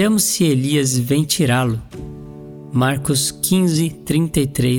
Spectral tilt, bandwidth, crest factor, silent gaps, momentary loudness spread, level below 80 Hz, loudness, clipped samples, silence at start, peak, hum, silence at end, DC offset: -4.5 dB/octave; 19.5 kHz; 14 dB; none; 18 LU; -42 dBFS; -17 LUFS; under 0.1%; 0 s; -4 dBFS; none; 0 s; under 0.1%